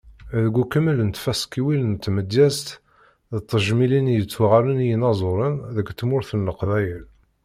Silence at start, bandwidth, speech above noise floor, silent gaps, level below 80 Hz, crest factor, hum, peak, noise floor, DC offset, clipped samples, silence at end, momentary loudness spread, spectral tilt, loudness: 0.05 s; 15.5 kHz; 34 dB; none; -50 dBFS; 18 dB; none; -4 dBFS; -55 dBFS; under 0.1%; under 0.1%; 0.4 s; 10 LU; -6.5 dB/octave; -21 LUFS